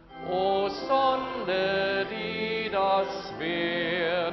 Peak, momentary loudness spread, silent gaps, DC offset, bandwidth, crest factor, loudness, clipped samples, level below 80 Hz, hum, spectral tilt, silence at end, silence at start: -12 dBFS; 6 LU; none; under 0.1%; 6.2 kHz; 16 dB; -27 LUFS; under 0.1%; -58 dBFS; none; -2 dB/octave; 0 s; 0.1 s